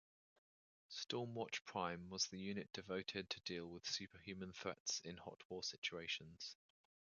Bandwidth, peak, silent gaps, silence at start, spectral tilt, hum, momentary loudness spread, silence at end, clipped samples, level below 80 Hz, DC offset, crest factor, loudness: 7.4 kHz; -26 dBFS; 4.80-4.86 s, 5.45-5.50 s, 5.78-5.82 s; 0.9 s; -2.5 dB/octave; none; 10 LU; 0.65 s; under 0.1%; -76 dBFS; under 0.1%; 22 dB; -47 LUFS